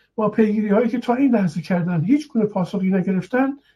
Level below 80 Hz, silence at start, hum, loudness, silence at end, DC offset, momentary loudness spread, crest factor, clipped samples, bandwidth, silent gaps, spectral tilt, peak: -62 dBFS; 0.2 s; none; -20 LUFS; 0.2 s; under 0.1%; 4 LU; 14 dB; under 0.1%; 11 kHz; none; -8.5 dB/octave; -4 dBFS